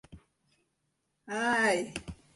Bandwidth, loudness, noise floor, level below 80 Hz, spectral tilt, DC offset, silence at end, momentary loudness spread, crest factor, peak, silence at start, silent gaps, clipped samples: 11.5 kHz; -30 LUFS; -79 dBFS; -60 dBFS; -3.5 dB/octave; under 0.1%; 0.2 s; 14 LU; 18 dB; -16 dBFS; 0.1 s; none; under 0.1%